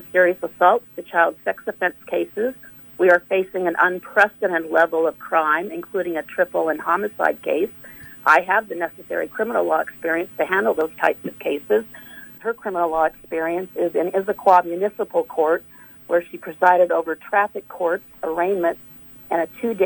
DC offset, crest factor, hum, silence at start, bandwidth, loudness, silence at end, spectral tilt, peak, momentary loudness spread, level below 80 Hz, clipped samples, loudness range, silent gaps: under 0.1%; 18 dB; none; 0 s; 19 kHz; -21 LUFS; 0 s; -5.5 dB/octave; -2 dBFS; 11 LU; -62 dBFS; under 0.1%; 3 LU; none